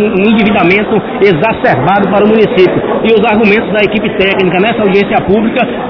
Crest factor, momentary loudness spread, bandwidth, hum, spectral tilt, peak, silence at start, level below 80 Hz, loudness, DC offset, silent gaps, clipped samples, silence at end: 8 dB; 3 LU; 5.4 kHz; none; -8.5 dB/octave; 0 dBFS; 0 s; -36 dBFS; -9 LUFS; under 0.1%; none; 1%; 0 s